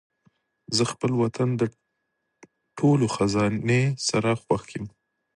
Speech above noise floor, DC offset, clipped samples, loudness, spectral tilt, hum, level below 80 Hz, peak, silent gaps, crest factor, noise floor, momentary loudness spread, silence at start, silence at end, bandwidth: 54 dB; under 0.1%; under 0.1%; -24 LUFS; -5.5 dB/octave; none; -56 dBFS; -8 dBFS; none; 18 dB; -78 dBFS; 10 LU; 0.7 s; 0.5 s; 11.5 kHz